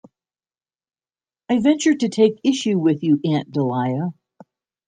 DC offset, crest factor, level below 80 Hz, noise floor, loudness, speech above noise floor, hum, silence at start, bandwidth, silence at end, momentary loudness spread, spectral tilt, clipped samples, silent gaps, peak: under 0.1%; 16 dB; -66 dBFS; under -90 dBFS; -19 LUFS; over 72 dB; none; 1.5 s; 9.4 kHz; 0.75 s; 6 LU; -6 dB/octave; under 0.1%; none; -4 dBFS